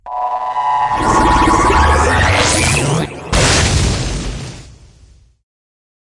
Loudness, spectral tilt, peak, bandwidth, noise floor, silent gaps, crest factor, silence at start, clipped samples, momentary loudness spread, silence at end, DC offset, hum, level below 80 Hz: -13 LUFS; -4 dB/octave; -2 dBFS; 11.5 kHz; -45 dBFS; none; 14 dB; 0.05 s; under 0.1%; 10 LU; 1.35 s; under 0.1%; none; -24 dBFS